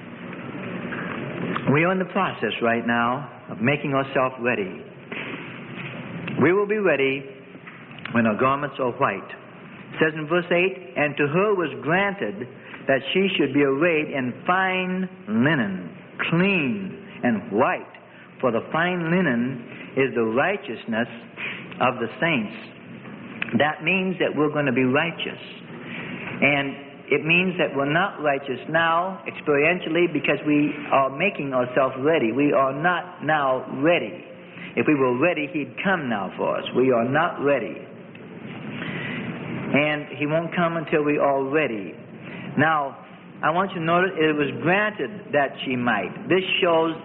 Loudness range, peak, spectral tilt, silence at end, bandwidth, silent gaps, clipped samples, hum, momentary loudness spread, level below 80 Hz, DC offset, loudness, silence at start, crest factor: 3 LU; -6 dBFS; -10.5 dB/octave; 0 s; 4.2 kHz; none; under 0.1%; none; 15 LU; -62 dBFS; under 0.1%; -23 LUFS; 0 s; 18 dB